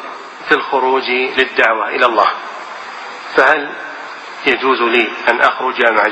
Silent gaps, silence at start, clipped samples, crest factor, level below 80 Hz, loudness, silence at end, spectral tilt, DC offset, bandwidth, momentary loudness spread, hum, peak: none; 0 s; under 0.1%; 16 dB; -58 dBFS; -13 LUFS; 0 s; -3 dB/octave; under 0.1%; 8.6 kHz; 15 LU; none; 0 dBFS